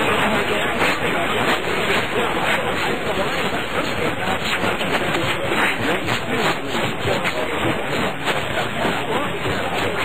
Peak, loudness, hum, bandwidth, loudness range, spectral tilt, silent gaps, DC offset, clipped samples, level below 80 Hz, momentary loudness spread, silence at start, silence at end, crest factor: -6 dBFS; -20 LUFS; none; 16 kHz; 2 LU; -4 dB/octave; none; 3%; under 0.1%; -44 dBFS; 3 LU; 0 s; 0 s; 14 dB